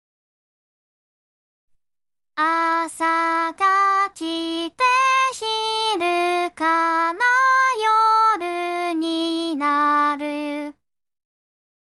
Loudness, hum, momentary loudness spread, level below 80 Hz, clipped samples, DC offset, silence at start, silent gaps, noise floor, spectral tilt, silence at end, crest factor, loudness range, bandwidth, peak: -19 LUFS; none; 9 LU; -70 dBFS; under 0.1%; under 0.1%; 2.35 s; none; under -90 dBFS; -1 dB/octave; 1.25 s; 14 dB; 5 LU; 12 kHz; -8 dBFS